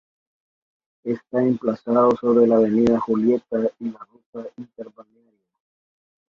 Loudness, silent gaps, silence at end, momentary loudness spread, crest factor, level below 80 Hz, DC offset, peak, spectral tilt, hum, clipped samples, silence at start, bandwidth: -20 LUFS; 4.26-4.33 s; 1.45 s; 21 LU; 18 dB; -58 dBFS; under 0.1%; -4 dBFS; -9 dB/octave; none; under 0.1%; 1.05 s; 7 kHz